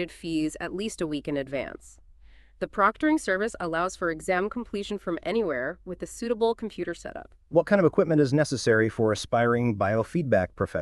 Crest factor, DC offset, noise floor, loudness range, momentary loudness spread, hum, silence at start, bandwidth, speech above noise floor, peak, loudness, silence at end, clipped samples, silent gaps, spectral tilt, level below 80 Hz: 18 dB; under 0.1%; -53 dBFS; 6 LU; 12 LU; none; 0 s; 12.5 kHz; 26 dB; -8 dBFS; -26 LUFS; 0 s; under 0.1%; none; -6 dB/octave; -52 dBFS